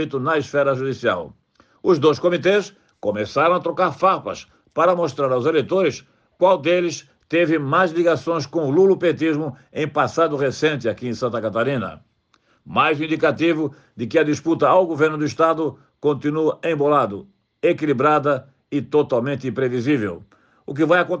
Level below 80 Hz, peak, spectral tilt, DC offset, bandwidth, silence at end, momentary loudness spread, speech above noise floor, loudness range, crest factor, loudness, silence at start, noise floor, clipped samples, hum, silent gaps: -64 dBFS; -4 dBFS; -6 dB/octave; under 0.1%; 8 kHz; 0 s; 10 LU; 43 dB; 3 LU; 16 dB; -20 LUFS; 0 s; -62 dBFS; under 0.1%; none; none